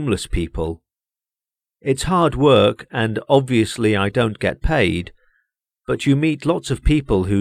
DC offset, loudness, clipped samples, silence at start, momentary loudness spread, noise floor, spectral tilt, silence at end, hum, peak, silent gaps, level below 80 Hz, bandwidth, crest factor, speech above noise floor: under 0.1%; -19 LUFS; under 0.1%; 0 s; 12 LU; under -90 dBFS; -6 dB/octave; 0 s; none; -2 dBFS; none; -32 dBFS; 14.5 kHz; 18 dB; over 72 dB